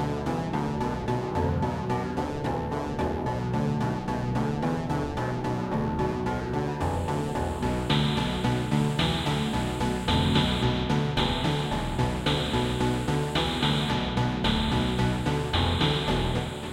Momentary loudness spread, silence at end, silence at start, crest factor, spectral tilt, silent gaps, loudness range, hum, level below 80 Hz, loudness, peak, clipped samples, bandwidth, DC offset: 5 LU; 0 s; 0 s; 16 dB; -6 dB/octave; none; 3 LU; none; -38 dBFS; -27 LUFS; -10 dBFS; under 0.1%; 16 kHz; under 0.1%